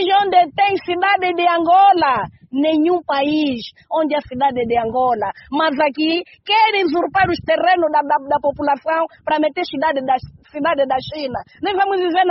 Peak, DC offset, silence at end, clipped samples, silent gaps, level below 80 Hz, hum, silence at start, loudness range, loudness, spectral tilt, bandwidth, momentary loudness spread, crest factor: -2 dBFS; under 0.1%; 0 s; under 0.1%; none; -52 dBFS; none; 0 s; 4 LU; -17 LUFS; -2 dB/octave; 6 kHz; 9 LU; 16 dB